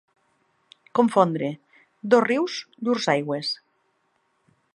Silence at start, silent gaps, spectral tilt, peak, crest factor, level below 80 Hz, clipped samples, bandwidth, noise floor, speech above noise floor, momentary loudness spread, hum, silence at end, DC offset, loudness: 0.95 s; none; -5.5 dB/octave; -4 dBFS; 22 dB; -76 dBFS; under 0.1%; 11 kHz; -70 dBFS; 48 dB; 13 LU; none; 1.2 s; under 0.1%; -23 LUFS